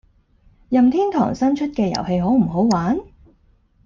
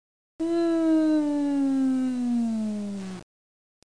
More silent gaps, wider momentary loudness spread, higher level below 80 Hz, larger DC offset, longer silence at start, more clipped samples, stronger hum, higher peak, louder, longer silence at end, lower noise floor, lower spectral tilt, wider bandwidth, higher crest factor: neither; second, 5 LU vs 12 LU; first, -46 dBFS vs -66 dBFS; second, under 0.1% vs 0.4%; first, 0.7 s vs 0.4 s; neither; neither; first, -6 dBFS vs -14 dBFS; first, -19 LUFS vs -25 LUFS; first, 0.85 s vs 0.6 s; second, -57 dBFS vs under -90 dBFS; about the same, -7 dB/octave vs -6.5 dB/octave; second, 7.2 kHz vs 10.5 kHz; about the same, 14 dB vs 12 dB